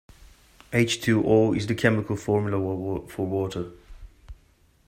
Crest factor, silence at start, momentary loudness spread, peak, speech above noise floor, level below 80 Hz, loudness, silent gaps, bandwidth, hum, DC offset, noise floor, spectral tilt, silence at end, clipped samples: 20 dB; 0.7 s; 11 LU; -4 dBFS; 36 dB; -50 dBFS; -25 LUFS; none; 16 kHz; none; under 0.1%; -60 dBFS; -6 dB/octave; 0.55 s; under 0.1%